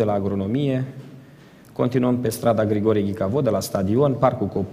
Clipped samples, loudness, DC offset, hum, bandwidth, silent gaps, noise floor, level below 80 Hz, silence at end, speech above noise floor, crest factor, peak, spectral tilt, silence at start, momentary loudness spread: under 0.1%; -21 LUFS; under 0.1%; none; 15.5 kHz; none; -47 dBFS; -54 dBFS; 0 s; 26 dB; 18 dB; -4 dBFS; -7.5 dB/octave; 0 s; 6 LU